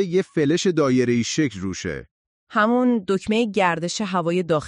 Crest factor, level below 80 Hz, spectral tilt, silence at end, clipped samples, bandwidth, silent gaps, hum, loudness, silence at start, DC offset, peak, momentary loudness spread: 16 dB; -54 dBFS; -5 dB/octave; 0 s; under 0.1%; 10.5 kHz; 2.11-2.47 s; none; -21 LUFS; 0 s; under 0.1%; -6 dBFS; 9 LU